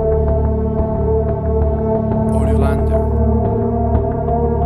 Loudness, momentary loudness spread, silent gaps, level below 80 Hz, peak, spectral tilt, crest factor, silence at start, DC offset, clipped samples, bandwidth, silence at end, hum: -17 LUFS; 2 LU; none; -20 dBFS; -2 dBFS; -10.5 dB/octave; 14 dB; 0 s; under 0.1%; under 0.1%; 9.4 kHz; 0 s; none